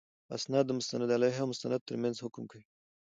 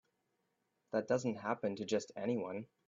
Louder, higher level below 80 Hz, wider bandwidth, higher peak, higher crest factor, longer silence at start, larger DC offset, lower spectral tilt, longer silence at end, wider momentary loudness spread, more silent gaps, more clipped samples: first, -33 LUFS vs -38 LUFS; about the same, -78 dBFS vs -80 dBFS; first, 9.2 kHz vs 7.8 kHz; first, -14 dBFS vs -20 dBFS; about the same, 20 dB vs 20 dB; second, 0.3 s vs 0.95 s; neither; about the same, -5 dB/octave vs -5 dB/octave; first, 0.45 s vs 0.25 s; first, 14 LU vs 4 LU; first, 1.81-1.86 s vs none; neither